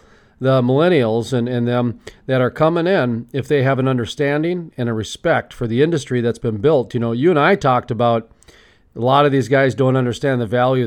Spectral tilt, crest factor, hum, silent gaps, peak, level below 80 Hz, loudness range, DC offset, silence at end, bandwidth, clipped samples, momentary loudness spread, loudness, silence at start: -7 dB/octave; 14 dB; none; none; -2 dBFS; -50 dBFS; 2 LU; under 0.1%; 0 s; 11.5 kHz; under 0.1%; 8 LU; -17 LUFS; 0.4 s